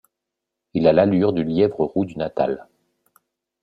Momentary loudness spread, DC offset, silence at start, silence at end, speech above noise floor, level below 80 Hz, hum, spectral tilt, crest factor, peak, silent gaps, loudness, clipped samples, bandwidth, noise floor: 9 LU; under 0.1%; 0.75 s; 1 s; 64 dB; -56 dBFS; none; -9.5 dB/octave; 18 dB; -4 dBFS; none; -20 LUFS; under 0.1%; 5.2 kHz; -83 dBFS